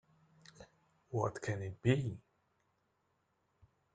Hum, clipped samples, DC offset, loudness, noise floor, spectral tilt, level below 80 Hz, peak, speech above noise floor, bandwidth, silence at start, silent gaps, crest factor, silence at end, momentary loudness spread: none; under 0.1%; under 0.1%; -37 LUFS; -80 dBFS; -7 dB/octave; -70 dBFS; -16 dBFS; 44 dB; 9.2 kHz; 0.6 s; none; 26 dB; 1.75 s; 22 LU